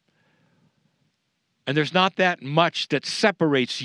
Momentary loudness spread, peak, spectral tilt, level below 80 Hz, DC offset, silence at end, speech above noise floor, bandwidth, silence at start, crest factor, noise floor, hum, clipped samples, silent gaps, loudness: 5 LU; -2 dBFS; -4.5 dB/octave; -82 dBFS; under 0.1%; 0 s; 52 dB; 11.5 kHz; 1.65 s; 22 dB; -74 dBFS; none; under 0.1%; none; -22 LUFS